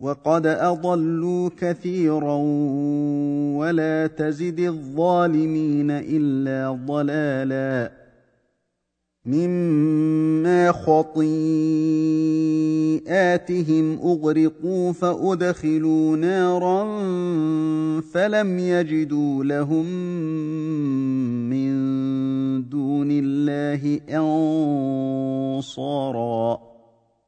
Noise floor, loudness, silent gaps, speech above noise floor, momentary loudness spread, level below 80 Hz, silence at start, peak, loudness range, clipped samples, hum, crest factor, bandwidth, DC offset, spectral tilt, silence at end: -77 dBFS; -22 LUFS; none; 56 dB; 6 LU; -62 dBFS; 0 s; -4 dBFS; 4 LU; under 0.1%; none; 18 dB; 9 kHz; under 0.1%; -8 dB/octave; 0.7 s